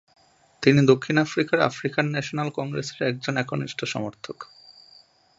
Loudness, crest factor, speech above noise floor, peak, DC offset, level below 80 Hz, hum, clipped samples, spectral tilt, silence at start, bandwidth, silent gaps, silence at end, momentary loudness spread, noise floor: -24 LUFS; 24 dB; 32 dB; -2 dBFS; under 0.1%; -64 dBFS; none; under 0.1%; -6 dB/octave; 0.6 s; 7.8 kHz; none; 0.95 s; 15 LU; -55 dBFS